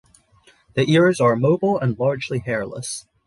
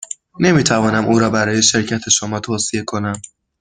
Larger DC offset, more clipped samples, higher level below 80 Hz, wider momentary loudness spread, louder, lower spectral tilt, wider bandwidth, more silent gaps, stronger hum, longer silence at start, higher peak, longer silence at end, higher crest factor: neither; neither; second, -56 dBFS vs -50 dBFS; about the same, 12 LU vs 10 LU; second, -20 LUFS vs -16 LUFS; first, -6 dB/octave vs -3.5 dB/octave; first, 11.5 kHz vs 10 kHz; neither; neither; first, 0.75 s vs 0 s; second, -4 dBFS vs 0 dBFS; about the same, 0.25 s vs 0.35 s; about the same, 16 dB vs 16 dB